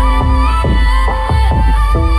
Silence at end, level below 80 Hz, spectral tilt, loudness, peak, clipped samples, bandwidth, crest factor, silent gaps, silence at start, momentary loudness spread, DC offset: 0 s; -12 dBFS; -6.5 dB/octave; -13 LUFS; -2 dBFS; under 0.1%; 11.5 kHz; 8 dB; none; 0 s; 1 LU; under 0.1%